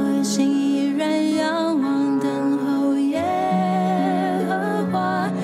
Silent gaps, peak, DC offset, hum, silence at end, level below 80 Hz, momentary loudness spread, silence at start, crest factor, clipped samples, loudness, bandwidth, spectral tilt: none; -8 dBFS; under 0.1%; none; 0 s; -68 dBFS; 2 LU; 0 s; 14 dB; under 0.1%; -21 LUFS; 13.5 kHz; -6 dB/octave